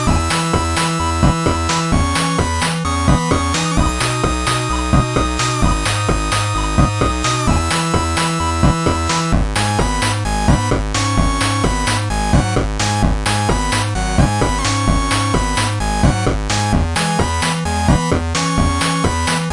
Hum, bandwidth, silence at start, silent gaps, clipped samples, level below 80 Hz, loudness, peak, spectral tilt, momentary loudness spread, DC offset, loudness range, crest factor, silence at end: none; 11.5 kHz; 0 s; none; under 0.1%; -22 dBFS; -16 LUFS; -2 dBFS; -4.5 dB/octave; 2 LU; under 0.1%; 0 LU; 14 dB; 0 s